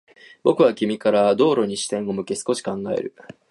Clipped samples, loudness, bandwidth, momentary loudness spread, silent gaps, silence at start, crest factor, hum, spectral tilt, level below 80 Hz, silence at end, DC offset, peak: under 0.1%; -21 LUFS; 11.5 kHz; 9 LU; none; 0.45 s; 16 dB; none; -5 dB/octave; -66 dBFS; 0.4 s; under 0.1%; -4 dBFS